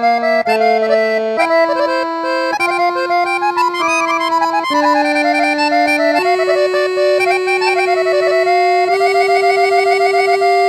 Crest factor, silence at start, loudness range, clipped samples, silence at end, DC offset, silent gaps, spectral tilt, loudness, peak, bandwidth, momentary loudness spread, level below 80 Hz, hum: 12 dB; 0 s; 2 LU; under 0.1%; 0 s; under 0.1%; none; -2.5 dB/octave; -13 LUFS; -2 dBFS; 13.5 kHz; 3 LU; -64 dBFS; none